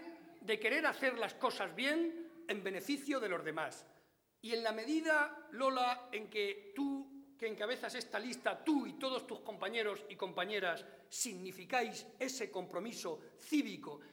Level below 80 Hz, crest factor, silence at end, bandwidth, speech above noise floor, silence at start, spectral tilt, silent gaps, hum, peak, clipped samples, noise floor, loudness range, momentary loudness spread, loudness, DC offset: -90 dBFS; 20 dB; 0 s; over 20 kHz; 29 dB; 0 s; -3 dB/octave; none; none; -20 dBFS; under 0.1%; -68 dBFS; 3 LU; 11 LU; -39 LUFS; under 0.1%